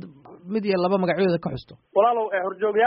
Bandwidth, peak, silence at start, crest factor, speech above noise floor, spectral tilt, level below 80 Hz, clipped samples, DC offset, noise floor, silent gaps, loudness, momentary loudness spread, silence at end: 5.6 kHz; -6 dBFS; 0 s; 16 dB; 20 dB; -5 dB/octave; -58 dBFS; under 0.1%; under 0.1%; -42 dBFS; none; -23 LUFS; 11 LU; 0 s